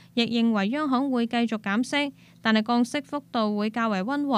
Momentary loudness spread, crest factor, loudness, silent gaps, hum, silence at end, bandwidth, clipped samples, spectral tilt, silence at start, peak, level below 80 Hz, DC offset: 5 LU; 16 dB; -25 LUFS; none; none; 0 s; 11.5 kHz; under 0.1%; -5 dB/octave; 0.15 s; -10 dBFS; -72 dBFS; under 0.1%